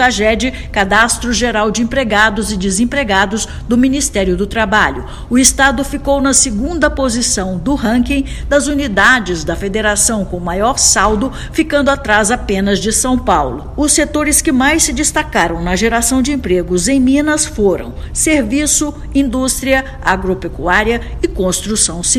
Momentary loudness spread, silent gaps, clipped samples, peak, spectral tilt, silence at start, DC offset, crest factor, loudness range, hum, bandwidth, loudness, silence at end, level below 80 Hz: 7 LU; none; 0.2%; 0 dBFS; -3 dB/octave; 0 s; under 0.1%; 14 dB; 2 LU; none; over 20 kHz; -13 LUFS; 0 s; -26 dBFS